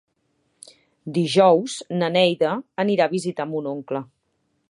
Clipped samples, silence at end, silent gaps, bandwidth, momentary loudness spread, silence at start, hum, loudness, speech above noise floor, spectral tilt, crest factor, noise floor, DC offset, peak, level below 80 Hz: under 0.1%; 0.65 s; none; 11.5 kHz; 12 LU; 1.05 s; none; -21 LUFS; 50 dB; -5.5 dB/octave; 18 dB; -71 dBFS; under 0.1%; -4 dBFS; -74 dBFS